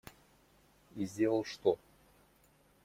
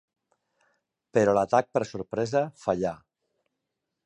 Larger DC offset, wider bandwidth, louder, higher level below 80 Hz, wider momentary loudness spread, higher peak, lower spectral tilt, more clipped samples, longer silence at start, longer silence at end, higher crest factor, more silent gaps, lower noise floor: neither; first, 16.5 kHz vs 11 kHz; second, -35 LUFS vs -26 LUFS; second, -72 dBFS vs -62 dBFS; first, 18 LU vs 10 LU; second, -16 dBFS vs -8 dBFS; about the same, -6 dB/octave vs -6 dB/octave; neither; second, 0.95 s vs 1.15 s; about the same, 1.1 s vs 1.1 s; about the same, 22 dB vs 22 dB; neither; second, -68 dBFS vs -83 dBFS